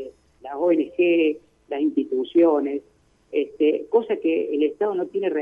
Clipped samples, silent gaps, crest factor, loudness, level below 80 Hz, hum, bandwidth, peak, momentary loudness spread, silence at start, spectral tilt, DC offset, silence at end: under 0.1%; none; 16 dB; -22 LUFS; -66 dBFS; none; 3.7 kHz; -6 dBFS; 14 LU; 0 s; -7.5 dB/octave; under 0.1%; 0 s